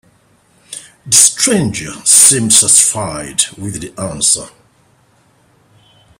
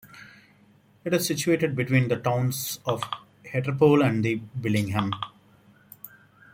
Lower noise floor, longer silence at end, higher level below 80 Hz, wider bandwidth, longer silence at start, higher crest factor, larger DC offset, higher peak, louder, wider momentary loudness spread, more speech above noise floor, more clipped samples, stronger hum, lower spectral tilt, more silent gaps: second, -52 dBFS vs -58 dBFS; first, 1.7 s vs 0.45 s; first, -48 dBFS vs -62 dBFS; first, over 20 kHz vs 17 kHz; first, 0.7 s vs 0.05 s; second, 14 dB vs 20 dB; neither; first, 0 dBFS vs -6 dBFS; first, -9 LUFS vs -25 LUFS; about the same, 19 LU vs 17 LU; first, 40 dB vs 34 dB; first, 0.4% vs under 0.1%; neither; second, -1.5 dB/octave vs -5.5 dB/octave; neither